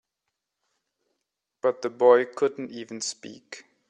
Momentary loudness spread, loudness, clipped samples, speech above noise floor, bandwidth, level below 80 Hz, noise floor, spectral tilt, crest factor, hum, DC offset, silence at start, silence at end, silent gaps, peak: 22 LU; -24 LUFS; under 0.1%; 58 dB; 9.4 kHz; -80 dBFS; -83 dBFS; -3 dB/octave; 22 dB; none; under 0.1%; 1.65 s; 0.3 s; none; -6 dBFS